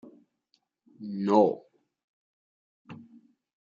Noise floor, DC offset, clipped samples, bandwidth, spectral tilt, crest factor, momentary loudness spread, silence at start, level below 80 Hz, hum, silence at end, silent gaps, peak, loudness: -75 dBFS; under 0.1%; under 0.1%; 7.4 kHz; -8 dB/octave; 24 dB; 26 LU; 0.05 s; -82 dBFS; none; 0.6 s; 2.04-2.85 s; -8 dBFS; -26 LUFS